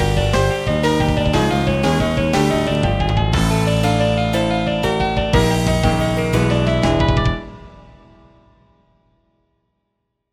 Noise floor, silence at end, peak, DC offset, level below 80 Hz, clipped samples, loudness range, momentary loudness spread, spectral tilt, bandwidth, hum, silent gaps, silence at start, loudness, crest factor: -73 dBFS; 2.5 s; -2 dBFS; under 0.1%; -28 dBFS; under 0.1%; 5 LU; 2 LU; -6 dB/octave; 16 kHz; none; none; 0 s; -17 LUFS; 16 dB